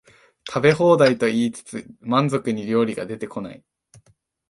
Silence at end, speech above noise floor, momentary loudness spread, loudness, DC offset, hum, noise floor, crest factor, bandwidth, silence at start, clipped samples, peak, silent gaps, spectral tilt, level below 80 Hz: 0.95 s; 41 dB; 18 LU; -20 LUFS; under 0.1%; none; -62 dBFS; 20 dB; 11.5 kHz; 0.45 s; under 0.1%; -2 dBFS; none; -6 dB/octave; -62 dBFS